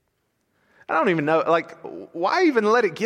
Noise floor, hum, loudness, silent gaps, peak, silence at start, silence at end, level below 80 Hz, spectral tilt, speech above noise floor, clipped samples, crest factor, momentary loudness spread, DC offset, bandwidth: -72 dBFS; none; -21 LUFS; none; -6 dBFS; 0.9 s; 0 s; -74 dBFS; -6 dB/octave; 51 dB; under 0.1%; 16 dB; 17 LU; under 0.1%; 10.5 kHz